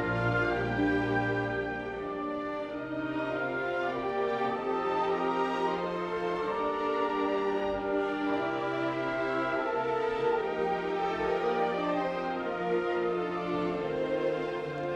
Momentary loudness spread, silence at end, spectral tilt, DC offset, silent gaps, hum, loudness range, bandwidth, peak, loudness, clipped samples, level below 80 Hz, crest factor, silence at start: 5 LU; 0 s; -7 dB/octave; under 0.1%; none; none; 2 LU; 9.2 kHz; -16 dBFS; -31 LUFS; under 0.1%; -56 dBFS; 14 dB; 0 s